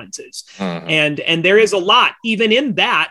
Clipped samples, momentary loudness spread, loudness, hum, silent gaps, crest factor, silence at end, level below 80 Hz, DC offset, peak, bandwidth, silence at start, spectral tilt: under 0.1%; 15 LU; -14 LUFS; none; none; 16 dB; 0 s; -62 dBFS; under 0.1%; 0 dBFS; 12 kHz; 0 s; -3.5 dB/octave